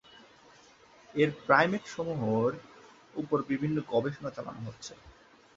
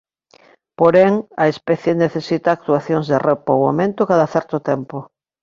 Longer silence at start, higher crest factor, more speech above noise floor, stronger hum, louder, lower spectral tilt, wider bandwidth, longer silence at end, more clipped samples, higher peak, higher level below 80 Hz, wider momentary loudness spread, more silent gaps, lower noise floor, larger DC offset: first, 1.15 s vs 0.8 s; first, 24 dB vs 16 dB; second, 28 dB vs 35 dB; neither; second, -30 LUFS vs -17 LUFS; about the same, -6.5 dB/octave vs -7.5 dB/octave; about the same, 7.8 kHz vs 7.4 kHz; about the same, 0.45 s vs 0.4 s; neither; second, -8 dBFS vs -2 dBFS; second, -66 dBFS vs -58 dBFS; first, 18 LU vs 7 LU; neither; first, -58 dBFS vs -52 dBFS; neither